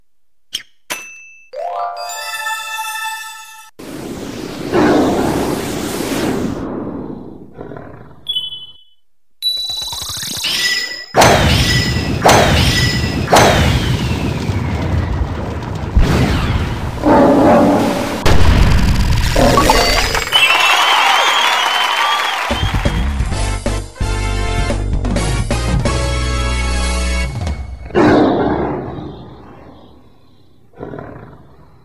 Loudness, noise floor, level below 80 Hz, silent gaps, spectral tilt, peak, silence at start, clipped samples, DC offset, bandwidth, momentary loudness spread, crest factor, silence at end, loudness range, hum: -14 LUFS; -70 dBFS; -22 dBFS; none; -4.5 dB/octave; 0 dBFS; 0.55 s; under 0.1%; under 0.1%; 15.5 kHz; 17 LU; 16 dB; 0.5 s; 12 LU; none